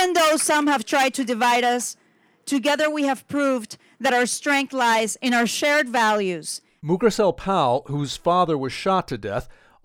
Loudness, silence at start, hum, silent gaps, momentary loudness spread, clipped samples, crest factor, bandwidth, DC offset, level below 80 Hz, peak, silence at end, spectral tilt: -21 LUFS; 0 s; none; none; 9 LU; under 0.1%; 16 dB; over 20 kHz; under 0.1%; -54 dBFS; -6 dBFS; 0.35 s; -3.5 dB/octave